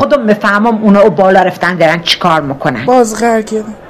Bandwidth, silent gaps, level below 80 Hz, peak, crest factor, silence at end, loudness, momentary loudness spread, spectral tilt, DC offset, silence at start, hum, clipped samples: 14 kHz; none; -44 dBFS; 0 dBFS; 10 dB; 0 s; -9 LUFS; 6 LU; -5 dB/octave; under 0.1%; 0 s; none; 1%